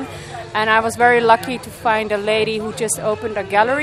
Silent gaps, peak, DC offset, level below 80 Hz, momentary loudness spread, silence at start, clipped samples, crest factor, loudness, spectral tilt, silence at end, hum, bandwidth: none; 0 dBFS; under 0.1%; -50 dBFS; 10 LU; 0 s; under 0.1%; 18 dB; -17 LUFS; -3 dB/octave; 0 s; none; 15 kHz